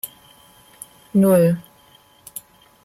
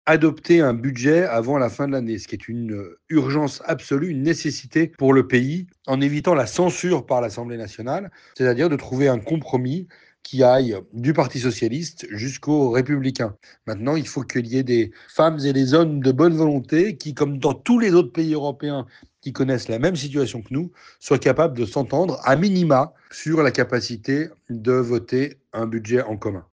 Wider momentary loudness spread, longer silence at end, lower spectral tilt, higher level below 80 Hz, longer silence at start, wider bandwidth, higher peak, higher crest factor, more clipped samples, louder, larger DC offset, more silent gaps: first, 26 LU vs 12 LU; first, 0.45 s vs 0.15 s; about the same, -7.5 dB/octave vs -6.5 dB/octave; about the same, -62 dBFS vs -58 dBFS; about the same, 0.05 s vs 0.05 s; first, 15.5 kHz vs 9.6 kHz; about the same, -6 dBFS vs -4 dBFS; about the same, 16 dB vs 16 dB; neither; first, -17 LUFS vs -21 LUFS; neither; neither